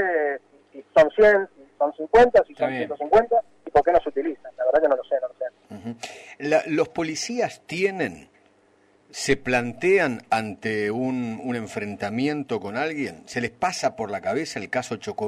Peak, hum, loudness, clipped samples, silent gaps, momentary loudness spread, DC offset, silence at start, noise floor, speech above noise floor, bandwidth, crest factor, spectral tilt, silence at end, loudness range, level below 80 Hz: -8 dBFS; none; -23 LUFS; under 0.1%; none; 14 LU; under 0.1%; 0 s; -60 dBFS; 37 dB; 13 kHz; 16 dB; -4.5 dB/octave; 0 s; 7 LU; -52 dBFS